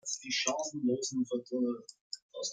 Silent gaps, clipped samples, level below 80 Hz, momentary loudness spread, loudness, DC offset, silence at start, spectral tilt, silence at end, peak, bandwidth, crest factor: 2.01-2.11 s, 2.22-2.29 s; under 0.1%; -84 dBFS; 13 LU; -34 LUFS; under 0.1%; 0.05 s; -2.5 dB/octave; 0 s; -14 dBFS; 9.6 kHz; 20 dB